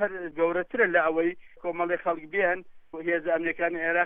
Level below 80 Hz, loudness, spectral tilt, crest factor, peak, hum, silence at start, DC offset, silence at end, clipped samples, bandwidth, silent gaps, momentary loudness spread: -62 dBFS; -27 LUFS; -8.5 dB/octave; 18 dB; -10 dBFS; none; 0 s; under 0.1%; 0 s; under 0.1%; 3.8 kHz; none; 11 LU